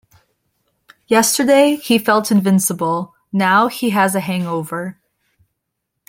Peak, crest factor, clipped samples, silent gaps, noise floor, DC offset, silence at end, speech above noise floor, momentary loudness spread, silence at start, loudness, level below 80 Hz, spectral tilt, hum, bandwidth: -2 dBFS; 16 dB; under 0.1%; none; -76 dBFS; under 0.1%; 1.2 s; 61 dB; 11 LU; 1.1 s; -16 LUFS; -62 dBFS; -4.5 dB/octave; none; 16.5 kHz